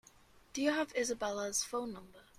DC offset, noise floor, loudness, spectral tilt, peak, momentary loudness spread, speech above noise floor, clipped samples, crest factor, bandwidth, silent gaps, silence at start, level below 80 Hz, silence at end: under 0.1%; -63 dBFS; -36 LUFS; -2 dB/octave; -20 dBFS; 12 LU; 27 dB; under 0.1%; 18 dB; 15.5 kHz; none; 0.35 s; -68 dBFS; 0.15 s